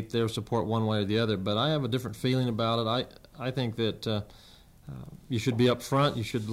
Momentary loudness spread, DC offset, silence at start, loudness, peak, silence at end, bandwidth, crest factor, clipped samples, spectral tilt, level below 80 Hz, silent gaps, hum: 12 LU; under 0.1%; 0 s; -29 LUFS; -14 dBFS; 0 s; 15.5 kHz; 16 dB; under 0.1%; -6 dB/octave; -58 dBFS; none; none